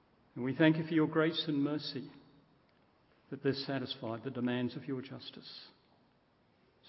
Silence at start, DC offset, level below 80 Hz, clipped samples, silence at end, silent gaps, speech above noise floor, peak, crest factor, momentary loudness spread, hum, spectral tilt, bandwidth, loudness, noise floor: 0.35 s; under 0.1%; -76 dBFS; under 0.1%; 1.2 s; none; 36 dB; -12 dBFS; 24 dB; 20 LU; none; -4.5 dB/octave; 5.8 kHz; -34 LUFS; -70 dBFS